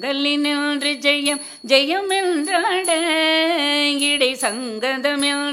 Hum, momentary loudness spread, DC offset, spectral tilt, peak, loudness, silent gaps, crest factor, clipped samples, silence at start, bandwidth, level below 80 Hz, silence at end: none; 6 LU; under 0.1%; -0.5 dB/octave; -2 dBFS; -18 LUFS; none; 18 dB; under 0.1%; 0 s; 15.5 kHz; -70 dBFS; 0 s